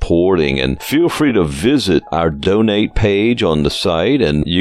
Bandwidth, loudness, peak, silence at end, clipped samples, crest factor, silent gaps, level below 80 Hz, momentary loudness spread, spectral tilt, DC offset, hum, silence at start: 16 kHz; -14 LUFS; 0 dBFS; 0 s; under 0.1%; 12 dB; none; -30 dBFS; 2 LU; -6 dB/octave; under 0.1%; none; 0 s